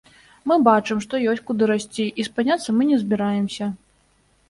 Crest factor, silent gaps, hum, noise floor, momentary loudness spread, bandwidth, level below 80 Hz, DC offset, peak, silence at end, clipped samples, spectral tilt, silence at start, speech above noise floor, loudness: 20 dB; none; 50 Hz at -60 dBFS; -61 dBFS; 10 LU; 11.5 kHz; -62 dBFS; under 0.1%; -2 dBFS; 0.75 s; under 0.1%; -5.5 dB/octave; 0.45 s; 41 dB; -21 LUFS